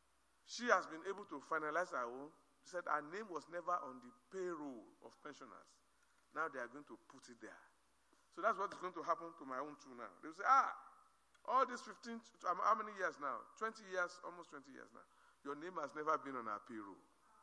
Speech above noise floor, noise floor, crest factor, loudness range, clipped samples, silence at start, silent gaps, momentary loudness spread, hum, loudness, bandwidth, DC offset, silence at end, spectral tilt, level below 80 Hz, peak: 33 dB; -77 dBFS; 26 dB; 11 LU; under 0.1%; 0.5 s; none; 21 LU; none; -42 LUFS; 11 kHz; under 0.1%; 0.45 s; -3.5 dB/octave; under -90 dBFS; -18 dBFS